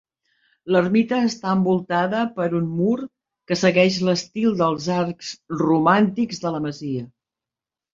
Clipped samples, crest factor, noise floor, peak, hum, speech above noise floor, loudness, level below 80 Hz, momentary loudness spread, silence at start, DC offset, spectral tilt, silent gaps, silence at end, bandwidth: under 0.1%; 18 dB; -89 dBFS; -2 dBFS; none; 69 dB; -21 LUFS; -62 dBFS; 12 LU; 0.65 s; under 0.1%; -6 dB/octave; none; 0.85 s; 7.6 kHz